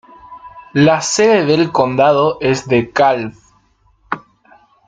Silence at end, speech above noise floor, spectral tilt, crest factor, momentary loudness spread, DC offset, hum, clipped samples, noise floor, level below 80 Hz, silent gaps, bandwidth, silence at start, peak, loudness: 0.7 s; 42 dB; -5 dB/octave; 14 dB; 15 LU; under 0.1%; none; under 0.1%; -55 dBFS; -52 dBFS; none; 9.6 kHz; 0.3 s; -2 dBFS; -13 LUFS